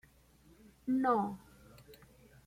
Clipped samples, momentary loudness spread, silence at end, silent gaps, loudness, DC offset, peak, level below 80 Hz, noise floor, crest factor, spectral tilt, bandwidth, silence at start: under 0.1%; 26 LU; 0.5 s; none; -34 LUFS; under 0.1%; -18 dBFS; -68 dBFS; -64 dBFS; 20 dB; -7.5 dB/octave; 16 kHz; 0.85 s